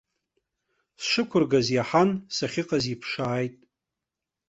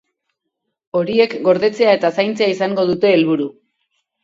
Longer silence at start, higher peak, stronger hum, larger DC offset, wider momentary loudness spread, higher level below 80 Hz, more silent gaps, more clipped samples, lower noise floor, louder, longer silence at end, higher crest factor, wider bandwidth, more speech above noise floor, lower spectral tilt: about the same, 1 s vs 0.95 s; second, -8 dBFS vs 0 dBFS; neither; neither; about the same, 8 LU vs 7 LU; about the same, -62 dBFS vs -62 dBFS; neither; neither; first, -87 dBFS vs -76 dBFS; second, -25 LUFS vs -16 LUFS; first, 0.95 s vs 0.7 s; about the same, 20 dB vs 16 dB; about the same, 8.2 kHz vs 7.8 kHz; about the same, 62 dB vs 61 dB; about the same, -5 dB/octave vs -6 dB/octave